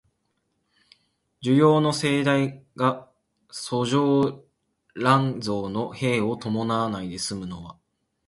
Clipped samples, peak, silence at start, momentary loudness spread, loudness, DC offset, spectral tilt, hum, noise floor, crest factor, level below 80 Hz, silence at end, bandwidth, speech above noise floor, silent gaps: under 0.1%; -4 dBFS; 1.4 s; 16 LU; -24 LUFS; under 0.1%; -6 dB/octave; none; -74 dBFS; 20 dB; -60 dBFS; 0.55 s; 11.5 kHz; 51 dB; none